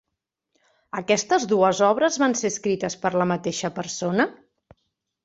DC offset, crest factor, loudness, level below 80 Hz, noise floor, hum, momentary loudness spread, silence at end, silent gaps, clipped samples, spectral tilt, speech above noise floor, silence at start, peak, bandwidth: under 0.1%; 18 dB; -23 LUFS; -64 dBFS; -82 dBFS; none; 9 LU; 0.9 s; none; under 0.1%; -4 dB/octave; 60 dB; 0.95 s; -6 dBFS; 8.2 kHz